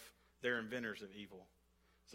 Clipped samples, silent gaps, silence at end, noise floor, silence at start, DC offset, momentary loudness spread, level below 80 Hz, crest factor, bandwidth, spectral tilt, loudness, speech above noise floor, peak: under 0.1%; none; 0 s; -72 dBFS; 0 s; under 0.1%; 19 LU; -78 dBFS; 22 dB; 16 kHz; -4.5 dB/octave; -44 LUFS; 28 dB; -26 dBFS